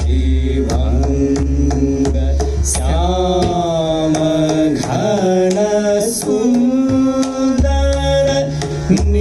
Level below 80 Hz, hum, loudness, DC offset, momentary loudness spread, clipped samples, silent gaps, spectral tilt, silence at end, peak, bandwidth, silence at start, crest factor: -20 dBFS; none; -15 LUFS; under 0.1%; 3 LU; under 0.1%; none; -6 dB/octave; 0 s; -2 dBFS; 13 kHz; 0 s; 12 dB